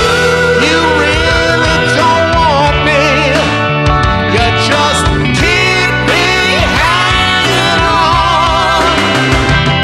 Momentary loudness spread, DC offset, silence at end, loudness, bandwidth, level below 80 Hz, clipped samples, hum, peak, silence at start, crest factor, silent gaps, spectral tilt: 2 LU; under 0.1%; 0 s; -9 LUFS; 15 kHz; -22 dBFS; under 0.1%; none; 0 dBFS; 0 s; 10 dB; none; -4 dB/octave